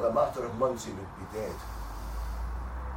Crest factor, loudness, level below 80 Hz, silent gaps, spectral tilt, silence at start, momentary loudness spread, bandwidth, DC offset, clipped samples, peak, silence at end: 18 dB; -34 LUFS; -40 dBFS; none; -6 dB/octave; 0 s; 11 LU; 16 kHz; under 0.1%; under 0.1%; -14 dBFS; 0 s